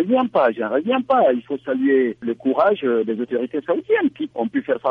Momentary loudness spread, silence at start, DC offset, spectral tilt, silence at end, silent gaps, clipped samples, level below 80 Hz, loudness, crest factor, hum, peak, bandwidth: 7 LU; 0 s; under 0.1%; -8 dB/octave; 0 s; none; under 0.1%; -66 dBFS; -20 LUFS; 14 dB; none; -6 dBFS; 4.9 kHz